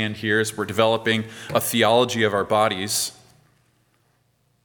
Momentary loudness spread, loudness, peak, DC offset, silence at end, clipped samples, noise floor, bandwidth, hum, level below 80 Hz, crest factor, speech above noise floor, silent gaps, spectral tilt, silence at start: 7 LU; -21 LUFS; -2 dBFS; under 0.1%; 1.5 s; under 0.1%; -65 dBFS; 19 kHz; none; -64 dBFS; 20 dB; 44 dB; none; -3.5 dB/octave; 0 s